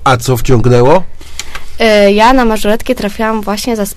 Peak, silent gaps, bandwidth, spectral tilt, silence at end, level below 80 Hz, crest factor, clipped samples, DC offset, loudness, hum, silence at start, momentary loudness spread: 0 dBFS; none; 14 kHz; -5.5 dB/octave; 0 s; -26 dBFS; 10 dB; 0.9%; under 0.1%; -10 LUFS; none; 0 s; 18 LU